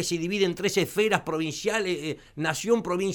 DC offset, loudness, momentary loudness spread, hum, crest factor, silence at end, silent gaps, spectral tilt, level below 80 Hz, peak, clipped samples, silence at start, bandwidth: under 0.1%; -26 LUFS; 6 LU; none; 20 dB; 0 s; none; -4 dB/octave; -58 dBFS; -8 dBFS; under 0.1%; 0 s; over 20 kHz